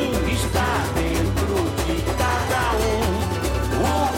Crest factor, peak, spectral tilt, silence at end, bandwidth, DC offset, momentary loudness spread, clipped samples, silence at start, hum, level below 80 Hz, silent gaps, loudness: 12 dB; -10 dBFS; -5 dB/octave; 0 s; 17 kHz; under 0.1%; 3 LU; under 0.1%; 0 s; none; -28 dBFS; none; -22 LUFS